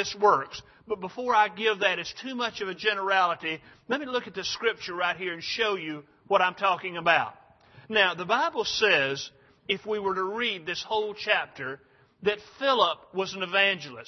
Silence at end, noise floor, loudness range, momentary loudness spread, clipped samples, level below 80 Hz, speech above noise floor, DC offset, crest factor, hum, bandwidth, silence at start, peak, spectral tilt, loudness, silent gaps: 0.05 s; -54 dBFS; 3 LU; 12 LU; under 0.1%; -68 dBFS; 27 dB; under 0.1%; 22 dB; none; 6.4 kHz; 0 s; -6 dBFS; -3 dB/octave; -26 LUFS; none